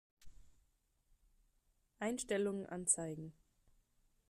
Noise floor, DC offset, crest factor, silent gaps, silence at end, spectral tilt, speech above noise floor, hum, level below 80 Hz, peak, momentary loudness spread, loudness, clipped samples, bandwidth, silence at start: -78 dBFS; under 0.1%; 26 dB; none; 1 s; -3.5 dB/octave; 39 dB; none; -70 dBFS; -18 dBFS; 13 LU; -39 LUFS; under 0.1%; 14.5 kHz; 0.2 s